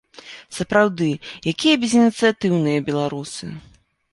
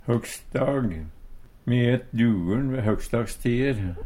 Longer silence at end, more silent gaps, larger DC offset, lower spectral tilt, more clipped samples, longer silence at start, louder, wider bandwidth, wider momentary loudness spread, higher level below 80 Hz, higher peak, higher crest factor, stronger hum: first, 0.55 s vs 0 s; neither; neither; second, -5 dB/octave vs -7 dB/octave; neither; first, 0.25 s vs 0.05 s; first, -19 LUFS vs -25 LUFS; second, 11.5 kHz vs 15.5 kHz; first, 19 LU vs 8 LU; second, -56 dBFS vs -40 dBFS; first, -2 dBFS vs -8 dBFS; about the same, 18 dB vs 16 dB; neither